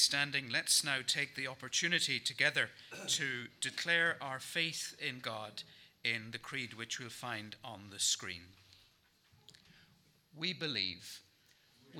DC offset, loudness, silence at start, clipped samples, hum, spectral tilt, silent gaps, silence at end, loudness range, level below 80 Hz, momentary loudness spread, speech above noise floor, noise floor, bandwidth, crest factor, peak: under 0.1%; -35 LUFS; 0 s; under 0.1%; none; -1 dB/octave; none; 0 s; 8 LU; -82 dBFS; 16 LU; 33 dB; -70 dBFS; over 20 kHz; 24 dB; -14 dBFS